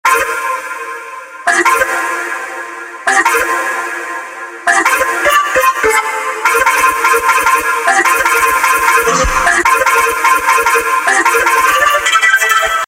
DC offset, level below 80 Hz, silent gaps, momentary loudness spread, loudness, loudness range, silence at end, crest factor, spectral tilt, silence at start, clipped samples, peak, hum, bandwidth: under 0.1%; -36 dBFS; none; 11 LU; -11 LUFS; 5 LU; 0 s; 12 dB; -1 dB/octave; 0.05 s; under 0.1%; 0 dBFS; none; 17 kHz